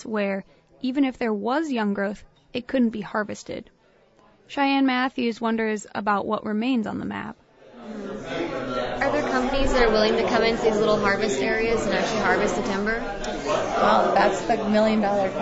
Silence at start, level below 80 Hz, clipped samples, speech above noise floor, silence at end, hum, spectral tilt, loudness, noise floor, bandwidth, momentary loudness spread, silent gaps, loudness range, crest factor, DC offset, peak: 0 s; -42 dBFS; under 0.1%; 35 dB; 0 s; none; -5 dB/octave; -23 LUFS; -58 dBFS; 8 kHz; 13 LU; none; 6 LU; 18 dB; under 0.1%; -6 dBFS